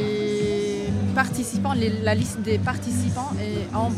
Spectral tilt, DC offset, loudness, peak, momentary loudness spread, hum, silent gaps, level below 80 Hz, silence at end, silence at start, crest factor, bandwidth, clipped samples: -6 dB/octave; under 0.1%; -24 LUFS; -6 dBFS; 4 LU; none; none; -46 dBFS; 0 s; 0 s; 18 dB; 14.5 kHz; under 0.1%